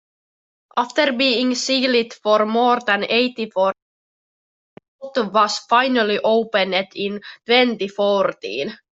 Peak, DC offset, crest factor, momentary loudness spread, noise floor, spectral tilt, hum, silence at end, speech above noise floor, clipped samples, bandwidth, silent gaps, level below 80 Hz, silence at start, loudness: -2 dBFS; under 0.1%; 18 dB; 10 LU; under -90 dBFS; -3.5 dB/octave; none; 0.2 s; over 71 dB; under 0.1%; 8.2 kHz; 3.82-4.77 s, 4.88-4.99 s; -70 dBFS; 0.75 s; -19 LUFS